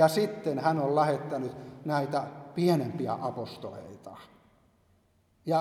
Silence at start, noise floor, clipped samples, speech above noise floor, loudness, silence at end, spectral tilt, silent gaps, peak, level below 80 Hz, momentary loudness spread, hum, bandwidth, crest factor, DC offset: 0 s; -67 dBFS; under 0.1%; 38 dB; -30 LUFS; 0 s; -6.5 dB/octave; none; -8 dBFS; -72 dBFS; 18 LU; none; 16 kHz; 22 dB; under 0.1%